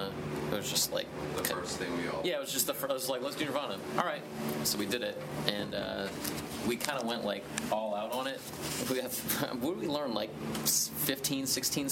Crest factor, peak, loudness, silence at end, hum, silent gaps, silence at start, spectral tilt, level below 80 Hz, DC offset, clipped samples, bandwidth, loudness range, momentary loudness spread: 26 dB; -8 dBFS; -33 LUFS; 0 s; none; none; 0 s; -3 dB/octave; -62 dBFS; under 0.1%; under 0.1%; 17 kHz; 2 LU; 7 LU